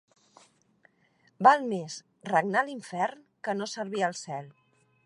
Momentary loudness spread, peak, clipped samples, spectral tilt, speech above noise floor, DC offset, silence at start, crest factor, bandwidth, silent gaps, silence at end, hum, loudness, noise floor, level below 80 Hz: 17 LU; -6 dBFS; under 0.1%; -4.5 dB/octave; 39 dB; under 0.1%; 1.4 s; 24 dB; 11 kHz; none; 0.55 s; none; -28 LUFS; -67 dBFS; -84 dBFS